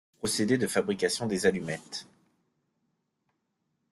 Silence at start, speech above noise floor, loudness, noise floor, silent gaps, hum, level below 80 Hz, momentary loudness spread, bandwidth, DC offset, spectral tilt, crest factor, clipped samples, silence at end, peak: 0.25 s; 50 dB; -28 LUFS; -79 dBFS; none; none; -66 dBFS; 11 LU; 12.5 kHz; under 0.1%; -4 dB/octave; 22 dB; under 0.1%; 1.9 s; -10 dBFS